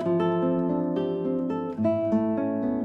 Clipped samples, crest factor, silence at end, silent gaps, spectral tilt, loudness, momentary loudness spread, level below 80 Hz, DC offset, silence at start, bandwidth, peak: under 0.1%; 12 dB; 0 s; none; -10 dB/octave; -26 LUFS; 4 LU; -60 dBFS; under 0.1%; 0 s; 6 kHz; -14 dBFS